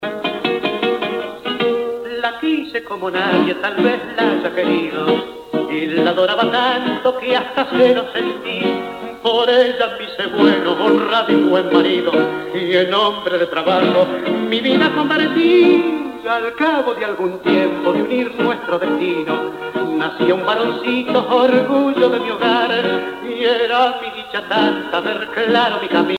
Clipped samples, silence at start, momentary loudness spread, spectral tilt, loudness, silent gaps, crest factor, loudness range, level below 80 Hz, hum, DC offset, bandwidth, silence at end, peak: under 0.1%; 0 s; 8 LU; -6 dB/octave; -17 LUFS; none; 16 dB; 3 LU; -58 dBFS; none; under 0.1%; 15.5 kHz; 0 s; 0 dBFS